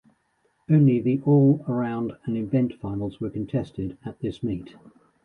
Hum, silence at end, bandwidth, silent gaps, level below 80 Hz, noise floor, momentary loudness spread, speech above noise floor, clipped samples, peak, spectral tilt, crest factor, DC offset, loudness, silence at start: none; 0.6 s; 4.3 kHz; none; -54 dBFS; -69 dBFS; 14 LU; 45 dB; under 0.1%; -8 dBFS; -11 dB/octave; 16 dB; under 0.1%; -24 LUFS; 0.7 s